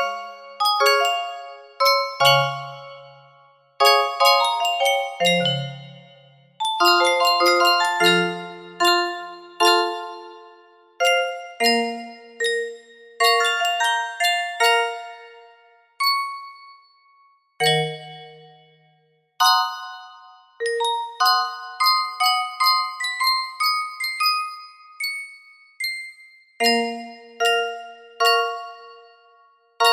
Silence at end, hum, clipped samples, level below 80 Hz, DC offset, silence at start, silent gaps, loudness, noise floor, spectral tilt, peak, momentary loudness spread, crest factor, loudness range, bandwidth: 0 s; none; under 0.1%; -74 dBFS; under 0.1%; 0 s; none; -20 LUFS; -63 dBFS; -2.5 dB/octave; -2 dBFS; 20 LU; 20 dB; 6 LU; 16 kHz